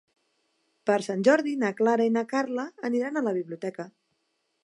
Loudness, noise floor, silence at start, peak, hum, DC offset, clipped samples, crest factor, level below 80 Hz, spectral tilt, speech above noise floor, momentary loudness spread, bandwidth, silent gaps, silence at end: -26 LUFS; -76 dBFS; 0.85 s; -8 dBFS; none; under 0.1%; under 0.1%; 20 dB; -82 dBFS; -5.5 dB/octave; 50 dB; 13 LU; 11.5 kHz; none; 0.75 s